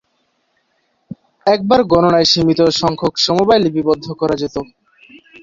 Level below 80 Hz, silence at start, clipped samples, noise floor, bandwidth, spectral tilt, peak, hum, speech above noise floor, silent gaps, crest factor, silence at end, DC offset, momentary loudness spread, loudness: -46 dBFS; 1.1 s; under 0.1%; -64 dBFS; 7.6 kHz; -5 dB/octave; -2 dBFS; none; 51 dB; none; 14 dB; 0.8 s; under 0.1%; 9 LU; -14 LUFS